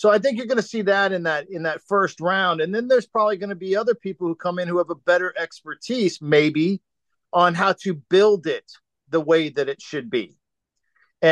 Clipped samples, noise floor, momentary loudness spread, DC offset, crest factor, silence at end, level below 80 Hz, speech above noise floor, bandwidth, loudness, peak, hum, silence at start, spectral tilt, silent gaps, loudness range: under 0.1%; -79 dBFS; 10 LU; under 0.1%; 16 dB; 0 s; -72 dBFS; 58 dB; 9.8 kHz; -21 LUFS; -4 dBFS; none; 0 s; -5.5 dB/octave; none; 2 LU